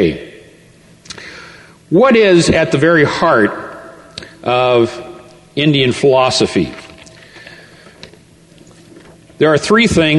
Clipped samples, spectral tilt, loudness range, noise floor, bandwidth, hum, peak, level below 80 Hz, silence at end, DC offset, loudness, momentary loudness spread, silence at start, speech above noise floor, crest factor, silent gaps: under 0.1%; -5 dB/octave; 6 LU; -44 dBFS; 11.5 kHz; none; 0 dBFS; -42 dBFS; 0 s; under 0.1%; -12 LUFS; 22 LU; 0 s; 33 dB; 14 dB; none